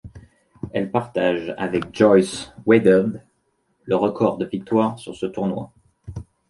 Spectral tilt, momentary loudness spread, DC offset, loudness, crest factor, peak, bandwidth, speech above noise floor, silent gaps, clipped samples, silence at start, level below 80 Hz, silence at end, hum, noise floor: -6.5 dB/octave; 21 LU; under 0.1%; -21 LUFS; 20 dB; -2 dBFS; 11.5 kHz; 48 dB; none; under 0.1%; 0.05 s; -52 dBFS; 0.3 s; none; -68 dBFS